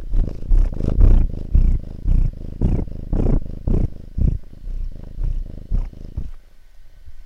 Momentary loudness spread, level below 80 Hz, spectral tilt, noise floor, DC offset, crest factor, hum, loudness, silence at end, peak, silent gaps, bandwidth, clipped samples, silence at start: 14 LU; -20 dBFS; -10 dB/octave; -40 dBFS; under 0.1%; 18 dB; none; -24 LUFS; 0 s; 0 dBFS; none; 2.5 kHz; under 0.1%; 0 s